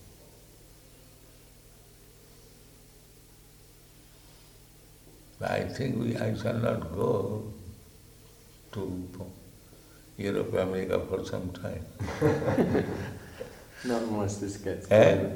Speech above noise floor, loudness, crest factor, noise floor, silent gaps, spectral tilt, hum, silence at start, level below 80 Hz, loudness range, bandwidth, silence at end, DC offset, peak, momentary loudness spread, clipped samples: 26 dB; -30 LUFS; 24 dB; -54 dBFS; none; -6.5 dB/octave; none; 0 s; -54 dBFS; 9 LU; 19.5 kHz; 0 s; under 0.1%; -8 dBFS; 18 LU; under 0.1%